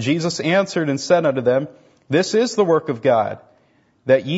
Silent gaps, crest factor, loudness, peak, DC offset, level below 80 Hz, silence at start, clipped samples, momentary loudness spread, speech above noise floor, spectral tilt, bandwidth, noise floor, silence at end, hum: none; 16 dB; -19 LUFS; -2 dBFS; under 0.1%; -64 dBFS; 0 s; under 0.1%; 7 LU; 41 dB; -5.5 dB/octave; 8 kHz; -59 dBFS; 0 s; none